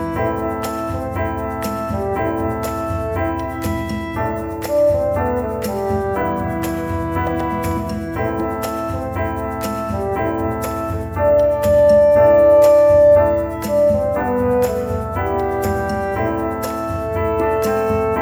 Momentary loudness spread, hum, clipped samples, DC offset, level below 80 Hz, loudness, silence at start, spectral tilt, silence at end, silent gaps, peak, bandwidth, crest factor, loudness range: 12 LU; none; under 0.1%; under 0.1%; -34 dBFS; -18 LUFS; 0 s; -7 dB/octave; 0 s; none; -2 dBFS; over 20 kHz; 14 dB; 9 LU